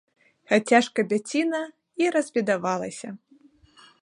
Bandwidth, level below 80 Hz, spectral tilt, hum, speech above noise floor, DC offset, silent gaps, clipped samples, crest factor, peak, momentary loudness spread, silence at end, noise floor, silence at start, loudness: 11 kHz; -72 dBFS; -4.5 dB/octave; none; 33 dB; under 0.1%; none; under 0.1%; 20 dB; -6 dBFS; 17 LU; 0.85 s; -57 dBFS; 0.5 s; -24 LUFS